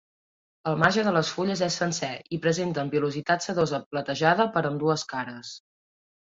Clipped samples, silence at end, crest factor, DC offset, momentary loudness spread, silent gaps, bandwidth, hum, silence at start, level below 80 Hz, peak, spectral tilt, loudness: under 0.1%; 0.65 s; 20 dB; under 0.1%; 11 LU; 3.86-3.91 s; 7.8 kHz; none; 0.65 s; -64 dBFS; -6 dBFS; -4.5 dB/octave; -26 LUFS